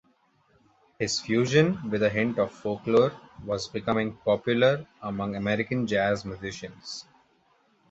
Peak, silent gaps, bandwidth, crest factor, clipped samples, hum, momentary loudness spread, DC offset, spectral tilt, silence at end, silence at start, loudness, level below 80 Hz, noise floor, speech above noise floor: -8 dBFS; none; 8.2 kHz; 20 dB; under 0.1%; none; 14 LU; under 0.1%; -5.5 dB/octave; 0.9 s; 1 s; -26 LUFS; -58 dBFS; -66 dBFS; 40 dB